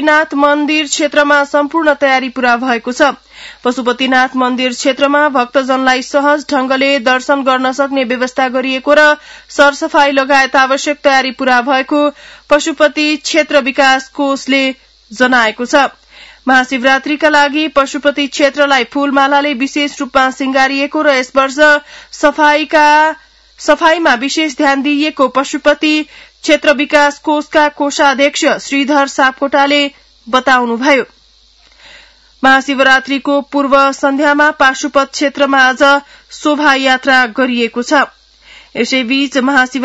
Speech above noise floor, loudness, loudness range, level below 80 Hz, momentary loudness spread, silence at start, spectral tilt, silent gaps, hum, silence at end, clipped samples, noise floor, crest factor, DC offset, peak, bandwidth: 36 dB; -11 LUFS; 2 LU; -50 dBFS; 5 LU; 0 s; -2 dB/octave; none; none; 0 s; 0.4%; -47 dBFS; 12 dB; under 0.1%; 0 dBFS; 10 kHz